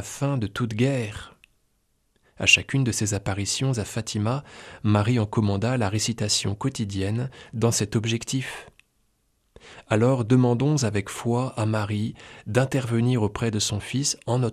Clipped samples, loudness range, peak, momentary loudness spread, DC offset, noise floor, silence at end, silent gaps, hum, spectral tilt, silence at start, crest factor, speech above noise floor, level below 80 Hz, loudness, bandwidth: under 0.1%; 3 LU; -2 dBFS; 9 LU; under 0.1%; -69 dBFS; 0 s; none; none; -4.5 dB/octave; 0 s; 22 dB; 45 dB; -54 dBFS; -24 LUFS; 13.5 kHz